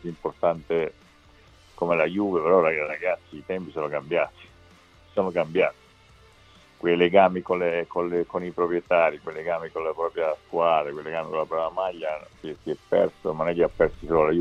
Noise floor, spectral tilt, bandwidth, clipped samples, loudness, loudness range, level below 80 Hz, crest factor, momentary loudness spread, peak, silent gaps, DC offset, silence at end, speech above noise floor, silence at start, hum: -54 dBFS; -7.5 dB/octave; 8.2 kHz; under 0.1%; -25 LUFS; 4 LU; -54 dBFS; 22 dB; 12 LU; -4 dBFS; none; under 0.1%; 0 s; 30 dB; 0 s; none